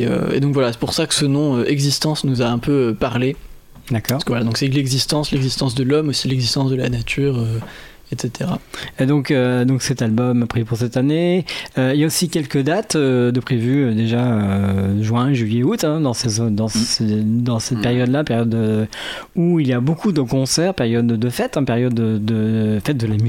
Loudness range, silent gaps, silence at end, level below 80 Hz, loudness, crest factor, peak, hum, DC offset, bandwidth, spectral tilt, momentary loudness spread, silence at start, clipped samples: 2 LU; none; 0 s; -44 dBFS; -18 LUFS; 16 dB; -2 dBFS; none; under 0.1%; 16.5 kHz; -5.5 dB/octave; 5 LU; 0 s; under 0.1%